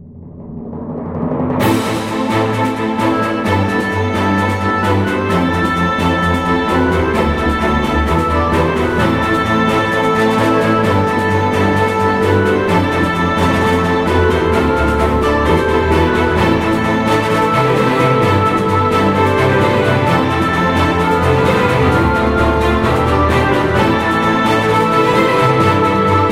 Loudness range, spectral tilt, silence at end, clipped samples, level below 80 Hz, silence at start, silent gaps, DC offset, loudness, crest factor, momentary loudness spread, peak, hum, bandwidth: 3 LU; -6.5 dB/octave; 0 s; under 0.1%; -28 dBFS; 0 s; none; under 0.1%; -13 LUFS; 12 dB; 3 LU; 0 dBFS; none; 16 kHz